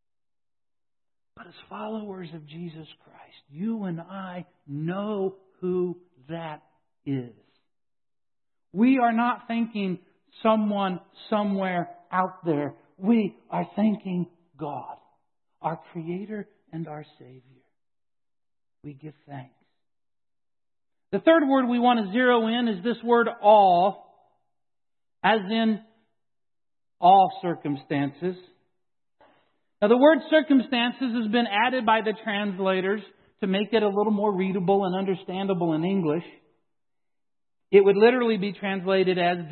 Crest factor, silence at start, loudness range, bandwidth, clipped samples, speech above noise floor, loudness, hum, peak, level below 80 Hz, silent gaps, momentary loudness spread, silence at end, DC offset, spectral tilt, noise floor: 22 dB; 1.4 s; 14 LU; 4.4 kHz; under 0.1%; over 66 dB; -24 LUFS; none; -4 dBFS; -76 dBFS; none; 19 LU; 0 s; under 0.1%; -10.5 dB/octave; under -90 dBFS